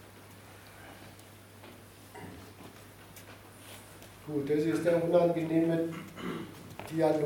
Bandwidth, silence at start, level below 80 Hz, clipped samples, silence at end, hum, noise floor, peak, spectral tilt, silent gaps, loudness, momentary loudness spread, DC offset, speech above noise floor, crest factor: 17.5 kHz; 0 s; -68 dBFS; under 0.1%; 0 s; none; -53 dBFS; -14 dBFS; -7 dB/octave; none; -30 LUFS; 24 LU; under 0.1%; 24 dB; 20 dB